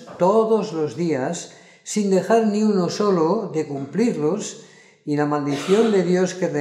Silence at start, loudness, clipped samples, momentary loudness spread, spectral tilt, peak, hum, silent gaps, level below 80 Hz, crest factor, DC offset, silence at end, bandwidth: 0 s; -21 LUFS; under 0.1%; 10 LU; -6 dB/octave; -4 dBFS; none; none; -74 dBFS; 16 dB; under 0.1%; 0 s; 12.5 kHz